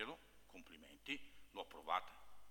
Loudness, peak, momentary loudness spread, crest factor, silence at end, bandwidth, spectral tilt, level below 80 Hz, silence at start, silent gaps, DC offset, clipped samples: -48 LUFS; -26 dBFS; 18 LU; 24 dB; 0 s; 19 kHz; -3 dB/octave; -74 dBFS; 0 s; none; under 0.1%; under 0.1%